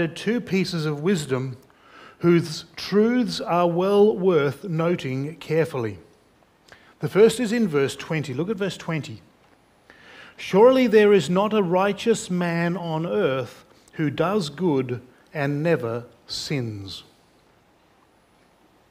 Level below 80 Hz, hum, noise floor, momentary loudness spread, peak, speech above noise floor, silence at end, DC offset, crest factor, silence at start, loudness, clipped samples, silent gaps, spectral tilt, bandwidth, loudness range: -62 dBFS; none; -59 dBFS; 15 LU; -4 dBFS; 37 dB; 1.9 s; under 0.1%; 20 dB; 0 s; -22 LUFS; under 0.1%; none; -6 dB/octave; 15.5 kHz; 7 LU